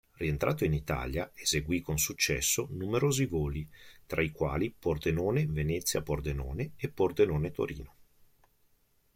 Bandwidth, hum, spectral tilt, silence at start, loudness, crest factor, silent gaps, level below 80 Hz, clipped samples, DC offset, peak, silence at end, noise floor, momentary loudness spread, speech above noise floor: 16.5 kHz; none; -4.5 dB/octave; 0.2 s; -31 LUFS; 18 dB; none; -46 dBFS; under 0.1%; under 0.1%; -14 dBFS; 1.3 s; -69 dBFS; 8 LU; 38 dB